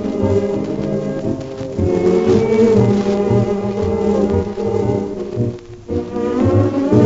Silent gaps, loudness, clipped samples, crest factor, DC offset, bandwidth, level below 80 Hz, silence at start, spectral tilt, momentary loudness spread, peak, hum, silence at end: none; -17 LUFS; under 0.1%; 16 dB; under 0.1%; 7.8 kHz; -38 dBFS; 0 s; -8.5 dB/octave; 10 LU; 0 dBFS; none; 0 s